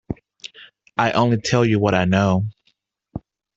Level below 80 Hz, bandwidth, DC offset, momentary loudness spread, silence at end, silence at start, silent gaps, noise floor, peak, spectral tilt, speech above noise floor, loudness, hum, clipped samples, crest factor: -50 dBFS; 8 kHz; under 0.1%; 20 LU; 0.4 s; 0.1 s; none; -66 dBFS; -4 dBFS; -6 dB/octave; 49 dB; -19 LUFS; none; under 0.1%; 18 dB